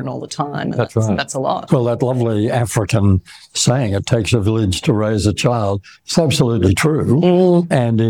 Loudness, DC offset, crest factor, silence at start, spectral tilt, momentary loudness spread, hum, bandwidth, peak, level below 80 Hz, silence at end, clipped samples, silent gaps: -16 LUFS; under 0.1%; 14 dB; 0 s; -6 dB/octave; 7 LU; none; 16.5 kHz; -2 dBFS; -42 dBFS; 0 s; under 0.1%; none